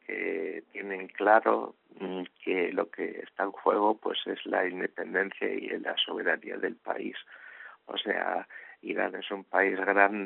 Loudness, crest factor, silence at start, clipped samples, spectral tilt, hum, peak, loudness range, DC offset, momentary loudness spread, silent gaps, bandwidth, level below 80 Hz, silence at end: -30 LUFS; 24 dB; 0.1 s; under 0.1%; -1 dB/octave; none; -6 dBFS; 4 LU; under 0.1%; 15 LU; none; 4 kHz; -82 dBFS; 0 s